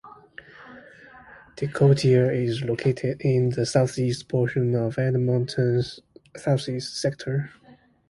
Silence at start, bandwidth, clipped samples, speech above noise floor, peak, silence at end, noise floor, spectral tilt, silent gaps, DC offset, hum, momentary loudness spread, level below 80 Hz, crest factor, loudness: 0.05 s; 11.5 kHz; under 0.1%; 26 dB; -6 dBFS; 0.6 s; -48 dBFS; -7 dB/octave; none; under 0.1%; none; 12 LU; -56 dBFS; 18 dB; -24 LUFS